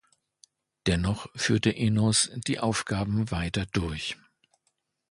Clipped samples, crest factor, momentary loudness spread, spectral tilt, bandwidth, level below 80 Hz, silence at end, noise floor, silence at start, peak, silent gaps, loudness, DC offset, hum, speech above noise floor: under 0.1%; 18 dB; 9 LU; -4.5 dB/octave; 11.5 kHz; -44 dBFS; 0.95 s; -76 dBFS; 0.85 s; -10 dBFS; none; -27 LUFS; under 0.1%; none; 50 dB